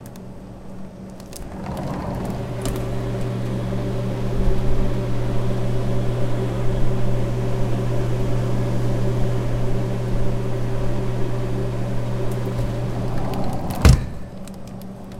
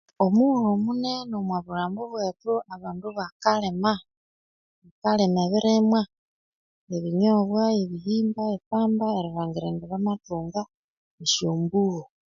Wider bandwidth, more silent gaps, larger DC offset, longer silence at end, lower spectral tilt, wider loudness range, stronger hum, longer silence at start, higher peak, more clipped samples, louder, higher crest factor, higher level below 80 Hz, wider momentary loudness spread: first, 14.5 kHz vs 7.4 kHz; second, none vs 3.32-3.40 s, 4.17-4.82 s, 4.91-5.02 s, 6.18-6.87 s, 8.66-8.71 s, 10.77-11.18 s; neither; second, 0 s vs 0.25 s; first, -7 dB/octave vs -5.5 dB/octave; about the same, 4 LU vs 4 LU; neither; second, 0 s vs 0.2 s; first, 0 dBFS vs -6 dBFS; neither; about the same, -24 LUFS vs -25 LUFS; about the same, 20 dB vs 20 dB; first, -28 dBFS vs -62 dBFS; about the same, 13 LU vs 11 LU